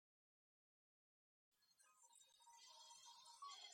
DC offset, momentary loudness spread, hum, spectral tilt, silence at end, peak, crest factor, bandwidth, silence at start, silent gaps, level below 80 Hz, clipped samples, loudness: under 0.1%; 11 LU; none; 3 dB/octave; 0 s; -46 dBFS; 20 dB; 16 kHz; 1.5 s; none; under -90 dBFS; under 0.1%; -63 LUFS